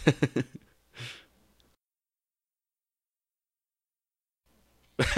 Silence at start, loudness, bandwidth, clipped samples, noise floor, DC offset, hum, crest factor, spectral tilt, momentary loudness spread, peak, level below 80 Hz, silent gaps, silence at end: 0 s; -33 LUFS; 13.5 kHz; under 0.1%; under -90 dBFS; under 0.1%; none; 28 dB; -5.5 dB/octave; 24 LU; -6 dBFS; -50 dBFS; none; 0 s